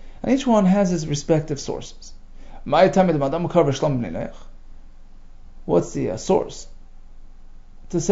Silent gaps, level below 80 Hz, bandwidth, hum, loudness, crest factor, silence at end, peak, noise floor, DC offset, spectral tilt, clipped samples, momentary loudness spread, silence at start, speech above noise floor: none; -38 dBFS; 8 kHz; 60 Hz at -45 dBFS; -21 LUFS; 20 dB; 0 s; -2 dBFS; -40 dBFS; under 0.1%; -6 dB/octave; under 0.1%; 16 LU; 0 s; 20 dB